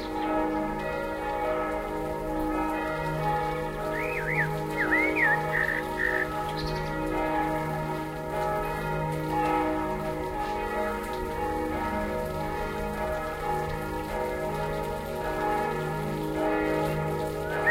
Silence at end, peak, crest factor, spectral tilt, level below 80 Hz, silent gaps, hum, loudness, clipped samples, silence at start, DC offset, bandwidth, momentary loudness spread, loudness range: 0 s; -12 dBFS; 16 dB; -6 dB/octave; -42 dBFS; none; none; -29 LUFS; under 0.1%; 0 s; under 0.1%; 16 kHz; 6 LU; 5 LU